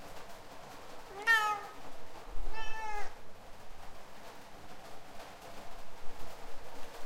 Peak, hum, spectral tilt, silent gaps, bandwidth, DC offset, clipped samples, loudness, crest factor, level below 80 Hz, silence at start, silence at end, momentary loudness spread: -16 dBFS; none; -2.5 dB/octave; none; 15.5 kHz; under 0.1%; under 0.1%; -34 LUFS; 18 dB; -48 dBFS; 0 s; 0 s; 22 LU